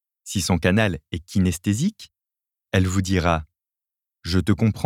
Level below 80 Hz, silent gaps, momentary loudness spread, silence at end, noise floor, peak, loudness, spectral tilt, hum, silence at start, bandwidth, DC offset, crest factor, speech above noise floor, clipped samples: -42 dBFS; none; 7 LU; 0 s; -89 dBFS; -4 dBFS; -22 LUFS; -5.5 dB/octave; none; 0.25 s; 16 kHz; under 0.1%; 20 dB; 68 dB; under 0.1%